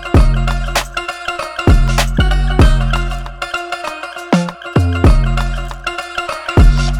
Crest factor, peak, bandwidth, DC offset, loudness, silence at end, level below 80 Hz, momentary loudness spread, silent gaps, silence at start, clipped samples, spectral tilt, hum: 12 dB; 0 dBFS; 14 kHz; under 0.1%; -16 LUFS; 0 s; -16 dBFS; 10 LU; none; 0 s; under 0.1%; -5.5 dB/octave; none